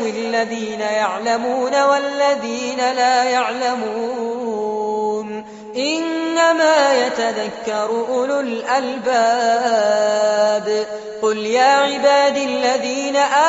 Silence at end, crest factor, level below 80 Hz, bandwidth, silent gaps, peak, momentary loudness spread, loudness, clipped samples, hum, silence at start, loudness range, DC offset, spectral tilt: 0 s; 14 dB; -64 dBFS; 8 kHz; none; -2 dBFS; 9 LU; -18 LUFS; under 0.1%; none; 0 s; 3 LU; under 0.1%; -1 dB/octave